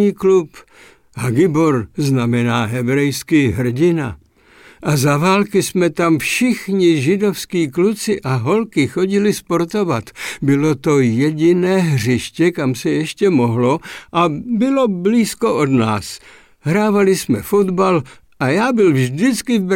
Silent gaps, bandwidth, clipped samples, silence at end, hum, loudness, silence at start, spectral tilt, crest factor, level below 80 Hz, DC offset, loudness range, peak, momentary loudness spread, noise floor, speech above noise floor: none; 17 kHz; under 0.1%; 0 s; none; -16 LUFS; 0 s; -6 dB/octave; 12 dB; -50 dBFS; under 0.1%; 2 LU; -4 dBFS; 6 LU; -47 dBFS; 31 dB